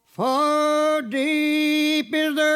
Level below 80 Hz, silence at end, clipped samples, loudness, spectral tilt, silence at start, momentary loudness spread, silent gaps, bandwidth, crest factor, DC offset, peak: -78 dBFS; 0 s; under 0.1%; -21 LUFS; -3.5 dB/octave; 0.2 s; 3 LU; none; 15.5 kHz; 10 dB; under 0.1%; -10 dBFS